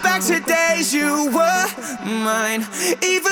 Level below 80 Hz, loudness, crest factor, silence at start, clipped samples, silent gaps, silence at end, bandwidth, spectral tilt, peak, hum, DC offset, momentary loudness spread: -62 dBFS; -18 LUFS; 16 dB; 0 s; under 0.1%; none; 0 s; over 20 kHz; -2 dB/octave; -4 dBFS; none; under 0.1%; 6 LU